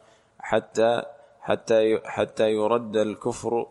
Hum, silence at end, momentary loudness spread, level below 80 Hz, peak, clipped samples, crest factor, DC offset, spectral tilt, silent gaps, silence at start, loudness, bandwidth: none; 0.05 s; 8 LU; -60 dBFS; -6 dBFS; under 0.1%; 18 dB; under 0.1%; -5 dB/octave; none; 0.45 s; -24 LUFS; 11.5 kHz